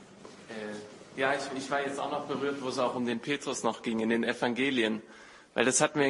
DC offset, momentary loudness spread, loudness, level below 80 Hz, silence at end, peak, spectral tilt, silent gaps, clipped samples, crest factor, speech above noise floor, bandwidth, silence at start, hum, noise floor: under 0.1%; 17 LU; -31 LUFS; -72 dBFS; 0 s; -6 dBFS; -3 dB/octave; none; under 0.1%; 24 dB; 20 dB; 11.5 kHz; 0 s; none; -50 dBFS